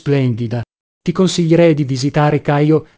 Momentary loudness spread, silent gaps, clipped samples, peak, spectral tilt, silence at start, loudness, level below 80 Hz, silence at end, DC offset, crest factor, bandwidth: 12 LU; 0.80-1.01 s; under 0.1%; 0 dBFS; -7 dB/octave; 0.05 s; -15 LUFS; -48 dBFS; 0.15 s; 0.1%; 14 dB; 8 kHz